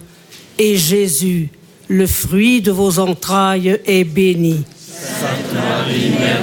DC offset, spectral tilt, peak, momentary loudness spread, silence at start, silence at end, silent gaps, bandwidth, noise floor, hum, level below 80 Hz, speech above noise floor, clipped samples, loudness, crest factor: under 0.1%; -4.5 dB/octave; -2 dBFS; 9 LU; 0 s; 0 s; none; 17.5 kHz; -41 dBFS; none; -40 dBFS; 26 dB; under 0.1%; -15 LUFS; 12 dB